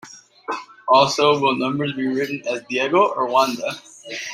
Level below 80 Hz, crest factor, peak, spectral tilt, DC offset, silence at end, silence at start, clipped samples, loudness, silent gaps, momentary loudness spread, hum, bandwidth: -66 dBFS; 18 dB; -2 dBFS; -4 dB/octave; under 0.1%; 0 s; 0.05 s; under 0.1%; -19 LUFS; none; 14 LU; none; 16 kHz